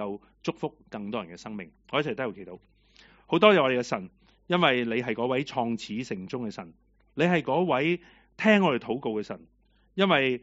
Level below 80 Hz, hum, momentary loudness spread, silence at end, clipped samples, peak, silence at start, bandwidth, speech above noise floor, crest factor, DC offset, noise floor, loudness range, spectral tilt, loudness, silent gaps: -66 dBFS; none; 18 LU; 0.05 s; under 0.1%; -2 dBFS; 0 s; 8 kHz; 31 dB; 24 dB; under 0.1%; -58 dBFS; 4 LU; -3.5 dB/octave; -27 LUFS; none